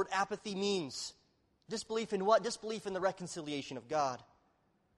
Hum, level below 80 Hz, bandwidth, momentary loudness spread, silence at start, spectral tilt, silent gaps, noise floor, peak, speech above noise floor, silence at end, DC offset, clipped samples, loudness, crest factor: none; -74 dBFS; 12.5 kHz; 12 LU; 0 s; -4 dB/octave; none; -74 dBFS; -16 dBFS; 38 dB; 0.75 s; under 0.1%; under 0.1%; -36 LUFS; 22 dB